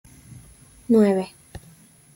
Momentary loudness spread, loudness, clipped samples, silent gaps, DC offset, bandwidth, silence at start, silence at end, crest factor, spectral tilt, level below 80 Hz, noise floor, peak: 26 LU; -20 LUFS; under 0.1%; none; under 0.1%; 16.5 kHz; 0.3 s; 0.85 s; 18 dB; -7.5 dB/octave; -54 dBFS; -51 dBFS; -8 dBFS